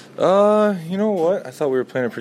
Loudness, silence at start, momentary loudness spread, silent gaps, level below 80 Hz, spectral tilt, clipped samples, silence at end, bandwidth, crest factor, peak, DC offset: -19 LUFS; 0.15 s; 8 LU; none; -70 dBFS; -7 dB/octave; under 0.1%; 0 s; 14.5 kHz; 14 dB; -4 dBFS; under 0.1%